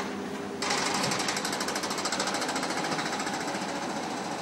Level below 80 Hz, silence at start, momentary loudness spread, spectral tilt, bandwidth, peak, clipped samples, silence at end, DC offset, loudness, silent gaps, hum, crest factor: -68 dBFS; 0 s; 6 LU; -2.5 dB/octave; 16 kHz; -14 dBFS; under 0.1%; 0 s; under 0.1%; -30 LUFS; none; none; 18 dB